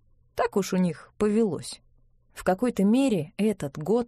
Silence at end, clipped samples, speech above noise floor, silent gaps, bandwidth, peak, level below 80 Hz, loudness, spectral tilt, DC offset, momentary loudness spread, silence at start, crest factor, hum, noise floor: 0 s; under 0.1%; 35 dB; none; 14.5 kHz; -12 dBFS; -56 dBFS; -26 LUFS; -6.5 dB/octave; under 0.1%; 12 LU; 0.35 s; 14 dB; none; -60 dBFS